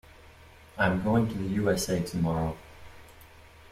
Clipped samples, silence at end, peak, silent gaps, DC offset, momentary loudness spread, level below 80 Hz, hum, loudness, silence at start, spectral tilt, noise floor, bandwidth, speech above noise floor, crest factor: under 0.1%; 0.3 s; -10 dBFS; none; under 0.1%; 16 LU; -50 dBFS; none; -28 LUFS; 0.4 s; -6 dB/octave; -52 dBFS; 16 kHz; 25 dB; 20 dB